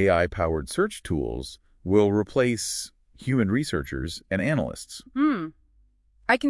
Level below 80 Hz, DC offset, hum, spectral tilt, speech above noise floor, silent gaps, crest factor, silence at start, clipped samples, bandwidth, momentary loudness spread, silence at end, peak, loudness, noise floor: -46 dBFS; under 0.1%; none; -5.5 dB/octave; 37 dB; none; 20 dB; 0 s; under 0.1%; 12 kHz; 14 LU; 0 s; -6 dBFS; -26 LUFS; -61 dBFS